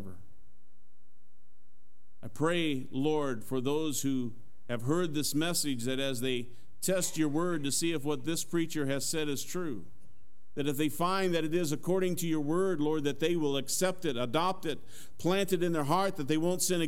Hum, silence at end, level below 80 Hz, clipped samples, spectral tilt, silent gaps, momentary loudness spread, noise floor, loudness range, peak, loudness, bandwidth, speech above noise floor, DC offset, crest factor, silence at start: none; 0 s; -66 dBFS; under 0.1%; -4.5 dB/octave; none; 8 LU; -71 dBFS; 3 LU; -14 dBFS; -32 LUFS; 16 kHz; 40 dB; 2%; 18 dB; 0 s